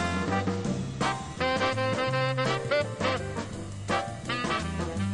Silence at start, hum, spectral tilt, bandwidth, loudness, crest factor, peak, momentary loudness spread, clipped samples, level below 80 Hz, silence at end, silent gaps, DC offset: 0 s; none; -5 dB/octave; 11.5 kHz; -29 LUFS; 16 dB; -14 dBFS; 6 LU; under 0.1%; -48 dBFS; 0 s; none; under 0.1%